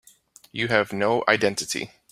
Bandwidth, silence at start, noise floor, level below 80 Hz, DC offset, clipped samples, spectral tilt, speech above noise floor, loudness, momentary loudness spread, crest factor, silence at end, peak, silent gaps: 16 kHz; 0.55 s; -54 dBFS; -62 dBFS; under 0.1%; under 0.1%; -3.5 dB/octave; 31 dB; -23 LUFS; 9 LU; 22 dB; 0.25 s; -2 dBFS; none